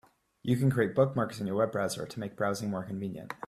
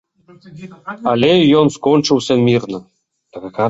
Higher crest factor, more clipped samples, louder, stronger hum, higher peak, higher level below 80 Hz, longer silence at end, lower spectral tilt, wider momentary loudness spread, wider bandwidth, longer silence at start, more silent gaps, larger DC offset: about the same, 18 dB vs 14 dB; neither; second, -31 LUFS vs -13 LUFS; neither; second, -12 dBFS vs -2 dBFS; second, -64 dBFS vs -54 dBFS; about the same, 0 s vs 0 s; about the same, -6.5 dB/octave vs -6 dB/octave; second, 11 LU vs 20 LU; first, 14.5 kHz vs 8 kHz; about the same, 0.45 s vs 0.5 s; neither; neither